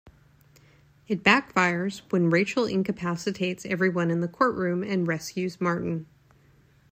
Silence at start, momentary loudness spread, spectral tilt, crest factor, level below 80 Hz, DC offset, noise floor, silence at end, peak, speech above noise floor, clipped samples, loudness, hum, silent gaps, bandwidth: 1.1 s; 9 LU; -6 dB/octave; 22 dB; -62 dBFS; under 0.1%; -59 dBFS; 0.85 s; -4 dBFS; 33 dB; under 0.1%; -26 LUFS; none; none; 15.5 kHz